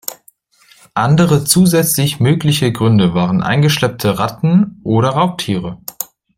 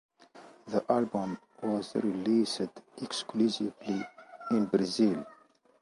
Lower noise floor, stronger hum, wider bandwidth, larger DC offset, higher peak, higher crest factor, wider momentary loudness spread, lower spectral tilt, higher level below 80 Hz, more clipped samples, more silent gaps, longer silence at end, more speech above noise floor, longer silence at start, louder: second, -50 dBFS vs -55 dBFS; neither; first, 16.5 kHz vs 11.5 kHz; neither; first, 0 dBFS vs -12 dBFS; second, 14 dB vs 20 dB; about the same, 12 LU vs 11 LU; about the same, -5.5 dB/octave vs -5.5 dB/octave; first, -46 dBFS vs -72 dBFS; neither; neither; second, 0.35 s vs 0.5 s; first, 37 dB vs 25 dB; second, 0.1 s vs 0.35 s; first, -13 LUFS vs -31 LUFS